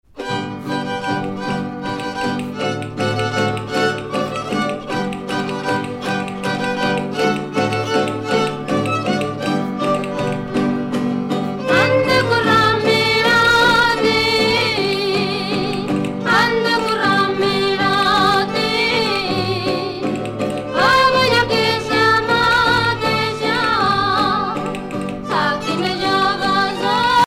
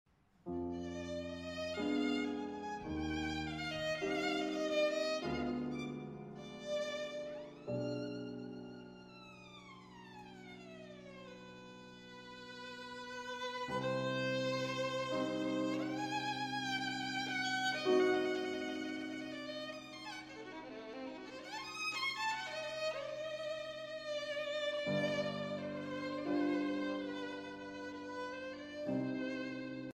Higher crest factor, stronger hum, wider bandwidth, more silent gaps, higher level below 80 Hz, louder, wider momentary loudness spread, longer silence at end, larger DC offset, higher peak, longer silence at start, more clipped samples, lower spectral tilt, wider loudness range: second, 14 dB vs 20 dB; neither; about the same, 16.5 kHz vs 15 kHz; neither; first, -44 dBFS vs -66 dBFS; first, -17 LUFS vs -40 LUFS; second, 9 LU vs 17 LU; about the same, 0 s vs 0.05 s; neither; first, -2 dBFS vs -22 dBFS; second, 0.15 s vs 0.45 s; neither; about the same, -4.5 dB/octave vs -4.5 dB/octave; second, 7 LU vs 11 LU